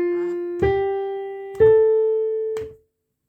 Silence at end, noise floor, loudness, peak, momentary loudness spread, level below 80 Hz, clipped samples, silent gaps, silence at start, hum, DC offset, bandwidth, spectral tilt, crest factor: 0.55 s; -66 dBFS; -20 LUFS; -6 dBFS; 15 LU; -46 dBFS; under 0.1%; none; 0 s; none; under 0.1%; 4.3 kHz; -8.5 dB/octave; 14 dB